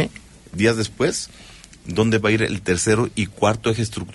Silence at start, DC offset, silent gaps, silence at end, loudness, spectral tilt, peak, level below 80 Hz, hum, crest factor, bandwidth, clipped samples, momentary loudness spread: 0 s; under 0.1%; none; 0 s; -21 LUFS; -5 dB/octave; -4 dBFS; -46 dBFS; none; 16 dB; 11.5 kHz; under 0.1%; 10 LU